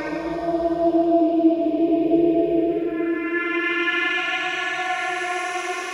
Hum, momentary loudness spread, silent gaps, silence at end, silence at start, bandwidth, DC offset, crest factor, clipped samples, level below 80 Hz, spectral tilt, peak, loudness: none; 6 LU; none; 0 s; 0 s; 11 kHz; under 0.1%; 14 dB; under 0.1%; -54 dBFS; -4.5 dB/octave; -6 dBFS; -21 LUFS